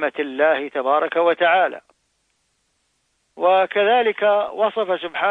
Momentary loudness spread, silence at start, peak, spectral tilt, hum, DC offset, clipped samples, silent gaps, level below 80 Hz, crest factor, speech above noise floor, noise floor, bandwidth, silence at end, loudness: 7 LU; 0 s; -6 dBFS; -5.5 dB/octave; none; under 0.1%; under 0.1%; none; -70 dBFS; 14 dB; 50 dB; -68 dBFS; 4.4 kHz; 0 s; -19 LUFS